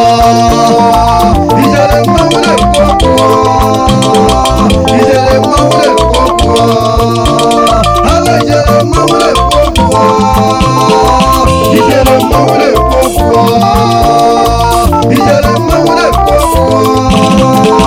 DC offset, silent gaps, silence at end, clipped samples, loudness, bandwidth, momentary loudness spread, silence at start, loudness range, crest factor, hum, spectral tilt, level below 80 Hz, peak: under 0.1%; none; 0 s; 5%; -7 LUFS; over 20 kHz; 2 LU; 0 s; 1 LU; 6 dB; none; -5.5 dB/octave; -18 dBFS; 0 dBFS